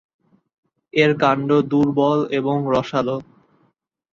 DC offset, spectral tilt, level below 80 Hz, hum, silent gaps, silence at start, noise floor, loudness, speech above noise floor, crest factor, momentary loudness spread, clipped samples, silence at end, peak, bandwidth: under 0.1%; -7 dB/octave; -56 dBFS; none; none; 0.95 s; -65 dBFS; -19 LUFS; 47 dB; 18 dB; 7 LU; under 0.1%; 0.9 s; -2 dBFS; 7.4 kHz